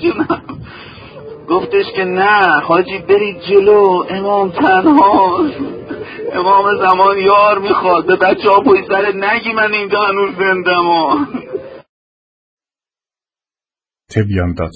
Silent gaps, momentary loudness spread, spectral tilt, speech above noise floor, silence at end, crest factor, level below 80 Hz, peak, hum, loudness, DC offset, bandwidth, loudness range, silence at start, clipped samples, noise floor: 11.89-12.57 s; 15 LU; -7.5 dB/octave; over 79 dB; 0.05 s; 14 dB; -40 dBFS; 0 dBFS; none; -12 LUFS; under 0.1%; 8 kHz; 7 LU; 0 s; under 0.1%; under -90 dBFS